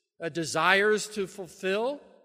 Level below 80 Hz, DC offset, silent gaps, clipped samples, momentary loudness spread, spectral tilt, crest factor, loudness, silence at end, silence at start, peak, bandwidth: -70 dBFS; under 0.1%; none; under 0.1%; 13 LU; -3 dB/octave; 22 dB; -27 LUFS; 0.25 s; 0.2 s; -6 dBFS; 15.5 kHz